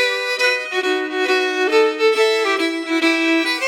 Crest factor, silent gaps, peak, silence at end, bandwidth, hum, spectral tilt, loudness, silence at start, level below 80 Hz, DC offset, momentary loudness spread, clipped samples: 14 dB; none; -4 dBFS; 0 s; 17 kHz; none; 0 dB/octave; -17 LUFS; 0 s; under -90 dBFS; under 0.1%; 4 LU; under 0.1%